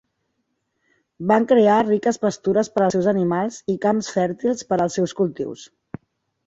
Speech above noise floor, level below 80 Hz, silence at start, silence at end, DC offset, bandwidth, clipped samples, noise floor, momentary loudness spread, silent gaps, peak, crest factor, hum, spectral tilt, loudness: 54 dB; -60 dBFS; 1.2 s; 0.8 s; under 0.1%; 8 kHz; under 0.1%; -73 dBFS; 15 LU; none; -4 dBFS; 18 dB; none; -6 dB/octave; -20 LUFS